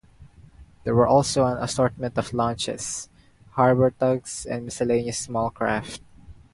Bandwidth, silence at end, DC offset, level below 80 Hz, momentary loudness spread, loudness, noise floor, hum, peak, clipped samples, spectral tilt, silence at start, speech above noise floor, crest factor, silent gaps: 11.5 kHz; 0.2 s; under 0.1%; -50 dBFS; 14 LU; -24 LUFS; -49 dBFS; none; -4 dBFS; under 0.1%; -5 dB/octave; 0.2 s; 26 dB; 20 dB; none